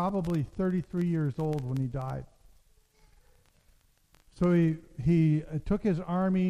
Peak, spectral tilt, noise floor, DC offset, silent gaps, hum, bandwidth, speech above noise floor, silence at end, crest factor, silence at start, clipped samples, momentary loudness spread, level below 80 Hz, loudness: -14 dBFS; -9.5 dB/octave; -64 dBFS; under 0.1%; none; none; 9.4 kHz; 36 dB; 0 s; 16 dB; 0 s; under 0.1%; 7 LU; -50 dBFS; -29 LUFS